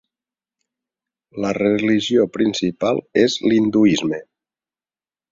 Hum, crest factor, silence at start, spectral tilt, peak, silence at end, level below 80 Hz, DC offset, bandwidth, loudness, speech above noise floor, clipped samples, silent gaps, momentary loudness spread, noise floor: none; 18 dB; 1.35 s; -5 dB/octave; -2 dBFS; 1.1 s; -56 dBFS; under 0.1%; 7.6 kHz; -18 LUFS; over 73 dB; under 0.1%; none; 10 LU; under -90 dBFS